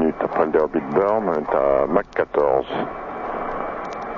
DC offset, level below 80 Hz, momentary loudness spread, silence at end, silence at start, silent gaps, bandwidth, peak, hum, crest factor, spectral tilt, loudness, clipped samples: under 0.1%; -46 dBFS; 9 LU; 0 s; 0 s; none; 7 kHz; -2 dBFS; none; 18 dB; -8 dB/octave; -21 LUFS; under 0.1%